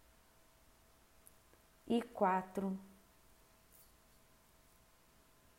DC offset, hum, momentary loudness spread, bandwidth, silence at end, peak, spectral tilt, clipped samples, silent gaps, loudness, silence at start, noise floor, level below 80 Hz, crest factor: under 0.1%; none; 29 LU; 16 kHz; 2.7 s; -20 dBFS; -6.5 dB/octave; under 0.1%; none; -38 LUFS; 1.85 s; -68 dBFS; -74 dBFS; 24 dB